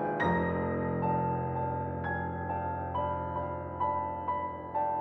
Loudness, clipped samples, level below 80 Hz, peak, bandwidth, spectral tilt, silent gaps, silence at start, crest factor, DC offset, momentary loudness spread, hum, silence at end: -33 LUFS; under 0.1%; -52 dBFS; -16 dBFS; 6.2 kHz; -9.5 dB/octave; none; 0 s; 16 dB; under 0.1%; 5 LU; none; 0 s